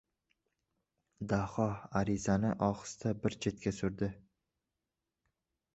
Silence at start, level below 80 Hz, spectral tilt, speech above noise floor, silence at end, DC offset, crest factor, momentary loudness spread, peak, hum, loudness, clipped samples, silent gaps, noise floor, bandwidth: 1.2 s; -58 dBFS; -7 dB/octave; 55 dB; 1.55 s; under 0.1%; 20 dB; 6 LU; -16 dBFS; none; -35 LUFS; under 0.1%; none; -89 dBFS; 8 kHz